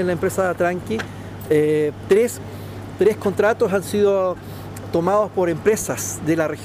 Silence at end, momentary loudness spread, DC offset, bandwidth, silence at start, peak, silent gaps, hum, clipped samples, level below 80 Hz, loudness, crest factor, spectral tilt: 0 s; 14 LU; under 0.1%; 15.5 kHz; 0 s; -6 dBFS; none; 50 Hz at -40 dBFS; under 0.1%; -50 dBFS; -20 LUFS; 14 dB; -5.5 dB/octave